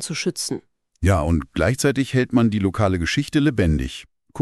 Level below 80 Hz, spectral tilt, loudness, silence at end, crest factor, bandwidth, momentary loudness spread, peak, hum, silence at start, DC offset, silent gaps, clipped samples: -34 dBFS; -5.5 dB/octave; -21 LUFS; 0 s; 16 dB; 13.5 kHz; 9 LU; -4 dBFS; none; 0 s; under 0.1%; none; under 0.1%